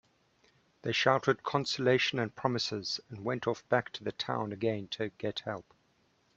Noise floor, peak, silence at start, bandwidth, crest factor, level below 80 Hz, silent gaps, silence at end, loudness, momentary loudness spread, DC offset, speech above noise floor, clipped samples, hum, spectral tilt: -71 dBFS; -8 dBFS; 0.85 s; 8 kHz; 24 dB; -70 dBFS; none; 0.75 s; -32 LUFS; 10 LU; under 0.1%; 39 dB; under 0.1%; none; -4.5 dB/octave